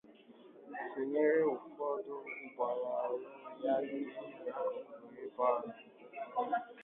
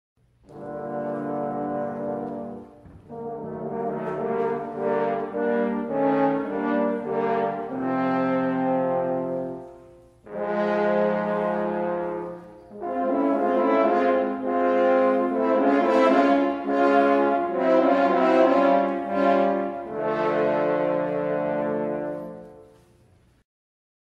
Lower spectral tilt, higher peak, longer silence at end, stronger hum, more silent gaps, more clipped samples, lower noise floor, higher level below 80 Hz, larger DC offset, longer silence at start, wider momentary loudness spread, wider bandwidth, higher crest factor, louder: second, -4 dB/octave vs -8 dB/octave; second, -18 dBFS vs -6 dBFS; second, 0 s vs 1.45 s; neither; neither; neither; about the same, -59 dBFS vs -58 dBFS; second, -86 dBFS vs -62 dBFS; neither; second, 0.05 s vs 0.5 s; about the same, 16 LU vs 14 LU; second, 3.9 kHz vs 7.6 kHz; about the same, 18 dB vs 18 dB; second, -37 LUFS vs -23 LUFS